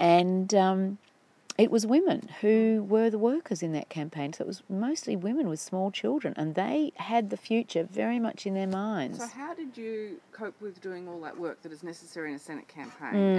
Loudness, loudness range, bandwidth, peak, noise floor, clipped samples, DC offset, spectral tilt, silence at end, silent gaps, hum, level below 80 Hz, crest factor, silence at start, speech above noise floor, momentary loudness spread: -29 LUFS; 13 LU; 11 kHz; -8 dBFS; -47 dBFS; under 0.1%; under 0.1%; -6 dB/octave; 0 s; none; none; -88 dBFS; 20 dB; 0 s; 19 dB; 16 LU